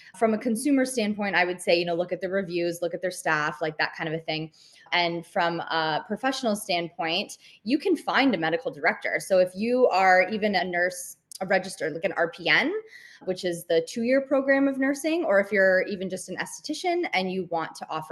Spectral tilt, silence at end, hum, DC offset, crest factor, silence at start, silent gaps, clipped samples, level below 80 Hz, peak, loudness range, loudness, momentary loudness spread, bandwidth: -4 dB/octave; 0 s; none; under 0.1%; 20 dB; 0.05 s; none; under 0.1%; -72 dBFS; -6 dBFS; 4 LU; -25 LUFS; 10 LU; 12.5 kHz